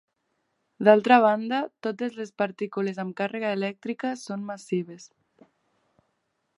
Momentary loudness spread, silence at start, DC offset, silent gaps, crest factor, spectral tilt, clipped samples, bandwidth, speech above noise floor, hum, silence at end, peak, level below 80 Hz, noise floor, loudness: 14 LU; 0.8 s; under 0.1%; none; 24 dB; -6 dB/octave; under 0.1%; 11.5 kHz; 51 dB; none; 1.5 s; -2 dBFS; -82 dBFS; -76 dBFS; -25 LUFS